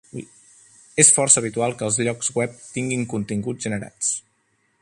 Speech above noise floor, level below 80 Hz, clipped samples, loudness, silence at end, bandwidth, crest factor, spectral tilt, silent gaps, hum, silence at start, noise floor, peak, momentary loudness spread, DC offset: 45 dB; -60 dBFS; under 0.1%; -20 LUFS; 0.6 s; 11.5 kHz; 22 dB; -3 dB/octave; none; none; 0.15 s; -67 dBFS; 0 dBFS; 15 LU; under 0.1%